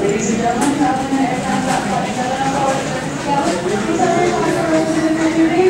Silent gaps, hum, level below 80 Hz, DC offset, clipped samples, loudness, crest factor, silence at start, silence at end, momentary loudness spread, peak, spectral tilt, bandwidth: none; none; -44 dBFS; under 0.1%; under 0.1%; -17 LUFS; 14 dB; 0 s; 0 s; 4 LU; -2 dBFS; -5 dB/octave; 16 kHz